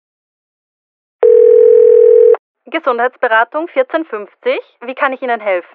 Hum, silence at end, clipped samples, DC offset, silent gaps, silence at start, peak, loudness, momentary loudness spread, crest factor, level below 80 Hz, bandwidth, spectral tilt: none; 0.15 s; under 0.1%; under 0.1%; 2.39-2.55 s; 1.2 s; 0 dBFS; -11 LUFS; 14 LU; 12 dB; -66 dBFS; 4.2 kHz; -7 dB/octave